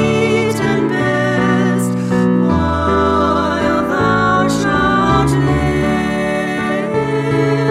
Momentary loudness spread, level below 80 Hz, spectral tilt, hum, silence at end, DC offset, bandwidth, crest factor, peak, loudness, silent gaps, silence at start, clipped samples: 4 LU; -34 dBFS; -6.5 dB/octave; none; 0 s; under 0.1%; 14.5 kHz; 12 dB; -2 dBFS; -15 LUFS; none; 0 s; under 0.1%